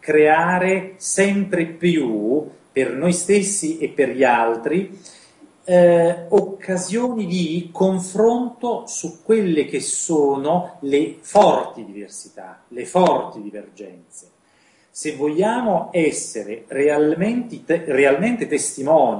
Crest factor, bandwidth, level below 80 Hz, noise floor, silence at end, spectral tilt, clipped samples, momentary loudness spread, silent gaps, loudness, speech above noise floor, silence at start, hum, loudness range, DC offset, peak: 18 dB; 11 kHz; -64 dBFS; -57 dBFS; 0 s; -5 dB/octave; under 0.1%; 16 LU; none; -19 LUFS; 38 dB; 0.05 s; none; 5 LU; under 0.1%; -2 dBFS